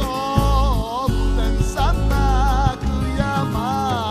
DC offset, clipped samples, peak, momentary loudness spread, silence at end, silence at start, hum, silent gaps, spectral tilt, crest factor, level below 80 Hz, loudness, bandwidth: under 0.1%; under 0.1%; -2 dBFS; 3 LU; 0 s; 0 s; none; none; -6 dB/octave; 16 dB; -20 dBFS; -20 LUFS; 15 kHz